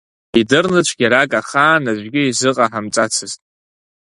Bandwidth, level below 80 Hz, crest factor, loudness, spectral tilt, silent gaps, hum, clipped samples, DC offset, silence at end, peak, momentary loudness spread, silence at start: 11.5 kHz; -54 dBFS; 16 dB; -15 LUFS; -3.5 dB/octave; none; none; under 0.1%; under 0.1%; 0.75 s; 0 dBFS; 6 LU; 0.35 s